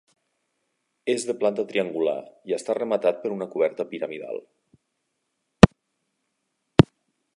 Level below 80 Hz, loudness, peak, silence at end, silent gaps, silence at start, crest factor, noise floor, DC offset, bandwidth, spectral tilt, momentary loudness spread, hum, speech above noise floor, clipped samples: -42 dBFS; -23 LUFS; 0 dBFS; 0.55 s; none; 1.05 s; 24 dB; -77 dBFS; under 0.1%; 11.5 kHz; -6.5 dB/octave; 16 LU; none; 51 dB; under 0.1%